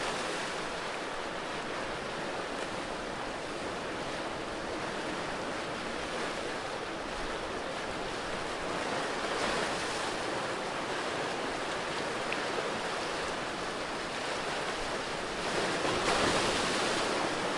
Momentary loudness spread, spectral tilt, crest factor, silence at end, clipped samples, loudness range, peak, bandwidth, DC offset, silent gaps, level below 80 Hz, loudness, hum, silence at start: 7 LU; -3 dB/octave; 18 dB; 0 s; under 0.1%; 5 LU; -16 dBFS; 11.5 kHz; under 0.1%; none; -54 dBFS; -34 LUFS; none; 0 s